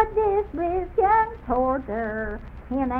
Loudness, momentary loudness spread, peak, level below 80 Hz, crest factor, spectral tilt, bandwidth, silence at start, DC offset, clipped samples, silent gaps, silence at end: -24 LUFS; 11 LU; -6 dBFS; -38 dBFS; 18 dB; -9.5 dB/octave; 4.7 kHz; 0 s; under 0.1%; under 0.1%; none; 0 s